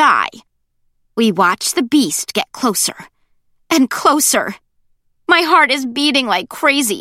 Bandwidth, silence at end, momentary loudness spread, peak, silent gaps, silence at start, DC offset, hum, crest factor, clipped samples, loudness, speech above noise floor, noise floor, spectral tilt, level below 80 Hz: 16.5 kHz; 0 s; 8 LU; 0 dBFS; none; 0 s; under 0.1%; none; 16 dB; under 0.1%; -14 LUFS; 48 dB; -63 dBFS; -2 dB/octave; -62 dBFS